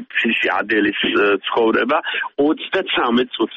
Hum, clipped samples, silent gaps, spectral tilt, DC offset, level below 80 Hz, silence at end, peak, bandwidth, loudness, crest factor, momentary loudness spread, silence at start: none; under 0.1%; none; -6 dB/octave; under 0.1%; -58 dBFS; 0 s; -6 dBFS; 7 kHz; -17 LUFS; 12 dB; 3 LU; 0 s